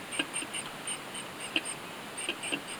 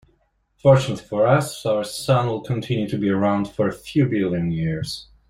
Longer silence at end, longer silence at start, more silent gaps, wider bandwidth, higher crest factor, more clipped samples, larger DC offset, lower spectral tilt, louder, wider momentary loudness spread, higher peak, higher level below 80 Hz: second, 0 s vs 0.25 s; second, 0 s vs 0.65 s; neither; first, over 20 kHz vs 15 kHz; first, 24 dB vs 18 dB; neither; neither; second, -1 dB/octave vs -6.5 dB/octave; second, -35 LUFS vs -21 LUFS; about the same, 6 LU vs 8 LU; second, -12 dBFS vs -2 dBFS; second, -72 dBFS vs -50 dBFS